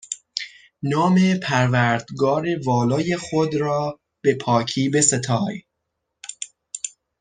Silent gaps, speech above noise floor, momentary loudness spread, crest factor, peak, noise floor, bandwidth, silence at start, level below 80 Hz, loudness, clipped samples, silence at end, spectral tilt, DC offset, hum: none; 58 dB; 16 LU; 20 dB; -2 dBFS; -78 dBFS; 9.8 kHz; 0.1 s; -60 dBFS; -21 LUFS; under 0.1%; 0.3 s; -4.5 dB/octave; under 0.1%; none